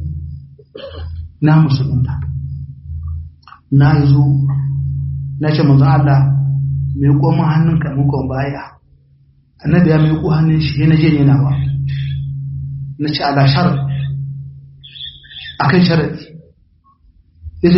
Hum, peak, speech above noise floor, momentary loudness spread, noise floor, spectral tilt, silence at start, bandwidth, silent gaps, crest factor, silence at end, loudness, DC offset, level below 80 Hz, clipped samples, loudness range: none; 0 dBFS; 41 dB; 18 LU; -52 dBFS; -7 dB/octave; 0 s; 5.8 kHz; none; 14 dB; 0 s; -14 LUFS; under 0.1%; -34 dBFS; under 0.1%; 5 LU